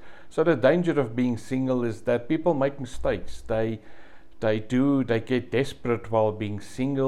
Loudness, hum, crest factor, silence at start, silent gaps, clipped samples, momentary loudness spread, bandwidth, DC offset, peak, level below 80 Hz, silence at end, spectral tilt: -26 LUFS; none; 18 dB; 0.05 s; none; under 0.1%; 9 LU; 12 kHz; 1%; -8 dBFS; -48 dBFS; 0 s; -7.5 dB/octave